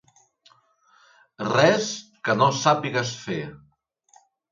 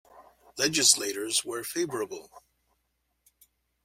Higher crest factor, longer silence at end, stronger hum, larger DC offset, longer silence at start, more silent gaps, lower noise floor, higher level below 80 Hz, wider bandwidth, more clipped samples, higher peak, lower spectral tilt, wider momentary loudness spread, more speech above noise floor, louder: about the same, 24 dB vs 26 dB; second, 0.95 s vs 1.45 s; neither; neither; first, 1.4 s vs 0.15 s; neither; second, -63 dBFS vs -77 dBFS; about the same, -66 dBFS vs -70 dBFS; second, 7.6 kHz vs 16.5 kHz; neither; about the same, -2 dBFS vs -4 dBFS; first, -4.5 dB/octave vs -1 dB/octave; second, 13 LU vs 17 LU; second, 41 dB vs 49 dB; first, -23 LUFS vs -26 LUFS